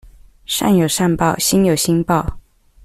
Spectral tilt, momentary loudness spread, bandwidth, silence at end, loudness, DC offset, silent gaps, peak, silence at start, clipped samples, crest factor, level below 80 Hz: -4.5 dB/octave; 5 LU; 15.5 kHz; 0.45 s; -16 LUFS; under 0.1%; none; -4 dBFS; 0.5 s; under 0.1%; 14 dB; -38 dBFS